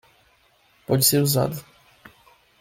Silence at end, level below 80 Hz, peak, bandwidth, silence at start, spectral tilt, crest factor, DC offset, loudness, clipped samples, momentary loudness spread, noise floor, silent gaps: 1 s; -58 dBFS; -6 dBFS; 16.5 kHz; 0.9 s; -4.5 dB/octave; 20 dB; under 0.1%; -20 LUFS; under 0.1%; 20 LU; -60 dBFS; none